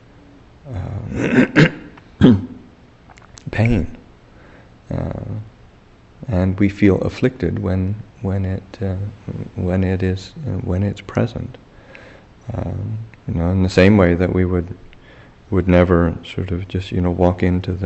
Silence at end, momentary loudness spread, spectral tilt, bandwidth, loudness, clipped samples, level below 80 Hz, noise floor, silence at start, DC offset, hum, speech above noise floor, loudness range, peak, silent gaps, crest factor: 0 s; 17 LU; -8 dB/octave; 8.2 kHz; -18 LUFS; under 0.1%; -38 dBFS; -47 dBFS; 0.65 s; under 0.1%; none; 29 dB; 8 LU; 0 dBFS; none; 18 dB